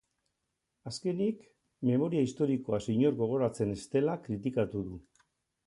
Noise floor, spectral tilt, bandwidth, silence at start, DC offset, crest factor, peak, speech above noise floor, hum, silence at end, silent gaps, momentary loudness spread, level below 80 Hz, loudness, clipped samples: -83 dBFS; -7.5 dB/octave; 11.5 kHz; 0.85 s; under 0.1%; 16 dB; -16 dBFS; 53 dB; none; 0.65 s; none; 13 LU; -62 dBFS; -32 LUFS; under 0.1%